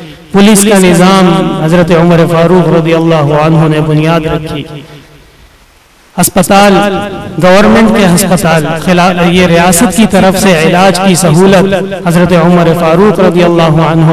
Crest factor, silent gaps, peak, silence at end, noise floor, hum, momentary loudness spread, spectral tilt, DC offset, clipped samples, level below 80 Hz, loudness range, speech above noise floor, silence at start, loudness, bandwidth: 6 dB; none; 0 dBFS; 0 s; -41 dBFS; none; 6 LU; -5.5 dB/octave; under 0.1%; 2%; -32 dBFS; 5 LU; 36 dB; 0 s; -6 LUFS; 15.5 kHz